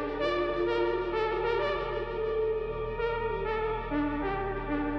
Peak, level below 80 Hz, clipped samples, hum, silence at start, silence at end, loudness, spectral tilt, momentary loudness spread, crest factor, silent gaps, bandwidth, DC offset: -16 dBFS; -44 dBFS; under 0.1%; none; 0 s; 0 s; -31 LUFS; -7.5 dB/octave; 4 LU; 14 dB; none; 6.2 kHz; under 0.1%